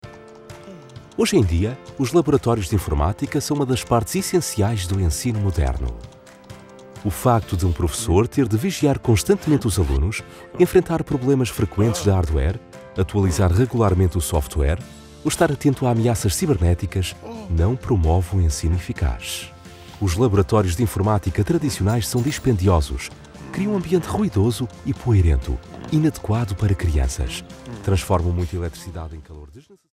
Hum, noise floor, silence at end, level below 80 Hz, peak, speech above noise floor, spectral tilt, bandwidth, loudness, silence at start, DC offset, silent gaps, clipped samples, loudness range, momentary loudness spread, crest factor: none; -42 dBFS; 0.35 s; -32 dBFS; -2 dBFS; 22 dB; -6 dB/octave; 16 kHz; -21 LUFS; 0.05 s; under 0.1%; none; under 0.1%; 3 LU; 13 LU; 18 dB